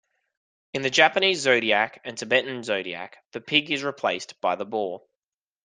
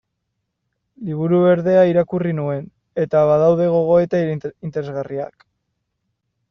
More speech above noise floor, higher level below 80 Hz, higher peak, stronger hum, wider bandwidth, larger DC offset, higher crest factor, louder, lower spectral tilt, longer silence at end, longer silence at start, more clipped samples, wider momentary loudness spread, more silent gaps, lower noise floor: first, over 65 dB vs 58 dB; second, -72 dBFS vs -56 dBFS; about the same, -2 dBFS vs -4 dBFS; neither; first, 10 kHz vs 6.4 kHz; neither; first, 24 dB vs 16 dB; second, -23 LUFS vs -18 LUFS; second, -2.5 dB/octave vs -8 dB/octave; second, 0.65 s vs 1.25 s; second, 0.75 s vs 1 s; neither; about the same, 16 LU vs 14 LU; first, 3.26-3.31 s vs none; first, under -90 dBFS vs -75 dBFS